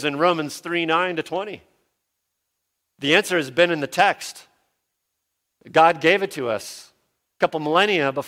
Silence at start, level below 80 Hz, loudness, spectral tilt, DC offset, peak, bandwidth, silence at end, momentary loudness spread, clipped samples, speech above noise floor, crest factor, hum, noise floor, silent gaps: 0 s; -68 dBFS; -20 LUFS; -4 dB/octave; under 0.1%; -2 dBFS; 16.5 kHz; 0 s; 13 LU; under 0.1%; 57 dB; 20 dB; none; -78 dBFS; none